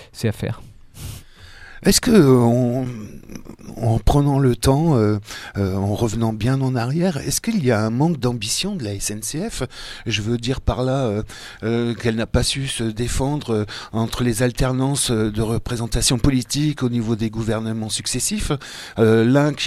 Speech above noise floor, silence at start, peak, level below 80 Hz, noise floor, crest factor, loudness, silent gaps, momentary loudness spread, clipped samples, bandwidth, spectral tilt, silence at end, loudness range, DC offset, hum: 22 dB; 0 s; 0 dBFS; -34 dBFS; -41 dBFS; 20 dB; -20 LUFS; none; 12 LU; under 0.1%; 15 kHz; -5 dB/octave; 0 s; 4 LU; under 0.1%; none